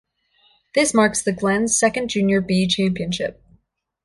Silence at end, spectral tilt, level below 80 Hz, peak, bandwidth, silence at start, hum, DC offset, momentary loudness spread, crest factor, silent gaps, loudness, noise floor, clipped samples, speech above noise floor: 0.7 s; -4 dB/octave; -52 dBFS; -4 dBFS; 11.5 kHz; 0.75 s; none; under 0.1%; 8 LU; 16 dB; none; -19 LUFS; -61 dBFS; under 0.1%; 42 dB